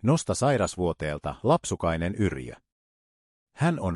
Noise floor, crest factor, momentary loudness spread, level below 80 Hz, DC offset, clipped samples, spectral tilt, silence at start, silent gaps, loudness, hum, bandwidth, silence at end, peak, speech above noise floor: under -90 dBFS; 18 dB; 7 LU; -50 dBFS; under 0.1%; under 0.1%; -6 dB/octave; 0.05 s; 2.72-3.47 s; -27 LUFS; none; 12 kHz; 0 s; -10 dBFS; over 64 dB